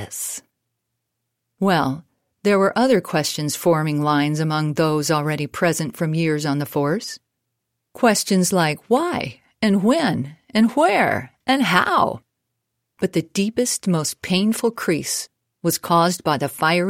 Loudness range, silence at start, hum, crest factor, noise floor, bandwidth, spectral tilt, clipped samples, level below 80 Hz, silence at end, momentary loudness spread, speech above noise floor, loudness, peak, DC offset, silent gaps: 3 LU; 0 s; none; 20 dB; -78 dBFS; 16.5 kHz; -4.5 dB/octave; under 0.1%; -60 dBFS; 0 s; 9 LU; 58 dB; -20 LUFS; 0 dBFS; under 0.1%; none